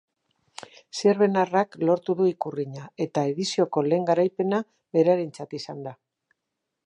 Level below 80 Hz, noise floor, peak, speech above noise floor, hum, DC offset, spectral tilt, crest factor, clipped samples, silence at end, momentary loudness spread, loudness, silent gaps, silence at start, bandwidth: -76 dBFS; -82 dBFS; -8 dBFS; 59 dB; none; under 0.1%; -6 dB/octave; 16 dB; under 0.1%; 0.95 s; 15 LU; -24 LUFS; none; 0.95 s; 10.5 kHz